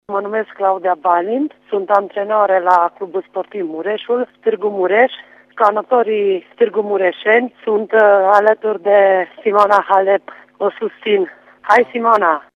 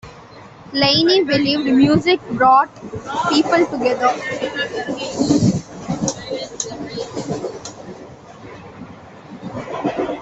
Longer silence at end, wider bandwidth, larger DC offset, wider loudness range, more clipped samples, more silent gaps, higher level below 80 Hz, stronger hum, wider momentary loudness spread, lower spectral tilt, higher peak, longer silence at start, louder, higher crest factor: first, 0.15 s vs 0 s; about the same, 8 kHz vs 8.2 kHz; neither; second, 4 LU vs 14 LU; neither; neither; second, -68 dBFS vs -50 dBFS; first, 50 Hz at -70 dBFS vs none; second, 10 LU vs 23 LU; about the same, -5.5 dB/octave vs -4.5 dB/octave; about the same, 0 dBFS vs -2 dBFS; about the same, 0.1 s vs 0.05 s; first, -15 LUFS vs -18 LUFS; about the same, 16 dB vs 16 dB